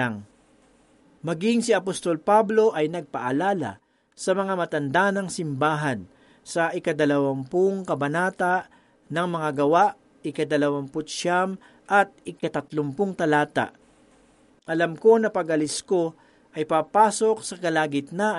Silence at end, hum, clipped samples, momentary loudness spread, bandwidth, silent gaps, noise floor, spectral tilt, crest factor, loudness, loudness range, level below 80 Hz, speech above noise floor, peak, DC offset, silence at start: 0 s; none; under 0.1%; 11 LU; 11.5 kHz; none; -58 dBFS; -5 dB/octave; 20 dB; -24 LUFS; 2 LU; -68 dBFS; 35 dB; -4 dBFS; under 0.1%; 0 s